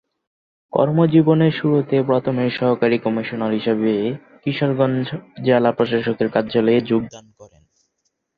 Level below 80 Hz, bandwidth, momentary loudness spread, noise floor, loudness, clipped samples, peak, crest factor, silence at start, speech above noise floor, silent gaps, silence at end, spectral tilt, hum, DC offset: -58 dBFS; 6.8 kHz; 9 LU; -72 dBFS; -19 LUFS; under 0.1%; -2 dBFS; 18 dB; 0.75 s; 54 dB; none; 0.9 s; -8.5 dB/octave; none; under 0.1%